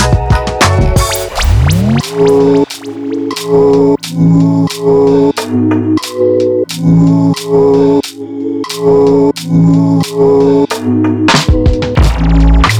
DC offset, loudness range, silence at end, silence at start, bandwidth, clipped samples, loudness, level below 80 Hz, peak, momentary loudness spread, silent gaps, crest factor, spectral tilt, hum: under 0.1%; 1 LU; 0 s; 0 s; over 20 kHz; under 0.1%; -10 LUFS; -18 dBFS; 0 dBFS; 6 LU; none; 8 dB; -6.5 dB/octave; none